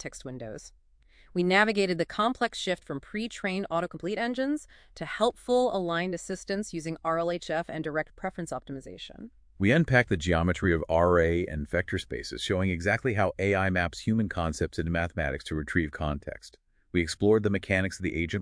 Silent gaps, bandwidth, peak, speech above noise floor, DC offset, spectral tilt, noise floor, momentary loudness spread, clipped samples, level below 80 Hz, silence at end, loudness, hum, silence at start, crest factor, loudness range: none; 10.5 kHz; -8 dBFS; 30 dB; under 0.1%; -5.5 dB/octave; -59 dBFS; 13 LU; under 0.1%; -46 dBFS; 0 s; -28 LUFS; none; 0 s; 20 dB; 5 LU